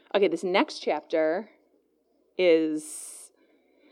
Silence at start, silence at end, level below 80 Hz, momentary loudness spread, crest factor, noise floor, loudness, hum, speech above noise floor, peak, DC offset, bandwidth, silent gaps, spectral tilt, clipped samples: 0.15 s; 0.65 s; under -90 dBFS; 18 LU; 20 dB; -69 dBFS; -26 LUFS; none; 43 dB; -8 dBFS; under 0.1%; 15.5 kHz; none; -4 dB/octave; under 0.1%